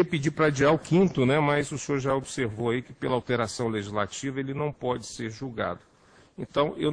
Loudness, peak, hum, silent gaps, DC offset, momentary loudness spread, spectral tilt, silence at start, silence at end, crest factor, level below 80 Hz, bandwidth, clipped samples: -27 LUFS; -8 dBFS; none; none; under 0.1%; 10 LU; -5.5 dB/octave; 0 s; 0 s; 18 dB; -56 dBFS; 10.5 kHz; under 0.1%